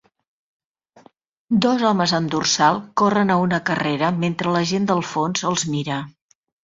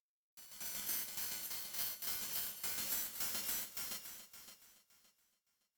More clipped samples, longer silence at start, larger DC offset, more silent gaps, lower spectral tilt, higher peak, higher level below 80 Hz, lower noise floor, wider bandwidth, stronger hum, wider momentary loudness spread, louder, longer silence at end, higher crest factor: neither; first, 1.5 s vs 0.35 s; neither; neither; first, -4.5 dB/octave vs 0.5 dB/octave; first, -2 dBFS vs -24 dBFS; first, -60 dBFS vs -74 dBFS; second, -53 dBFS vs -82 dBFS; second, 7.8 kHz vs 19.5 kHz; neither; second, 6 LU vs 17 LU; first, -20 LUFS vs -39 LUFS; second, 0.55 s vs 0.85 s; about the same, 18 dB vs 20 dB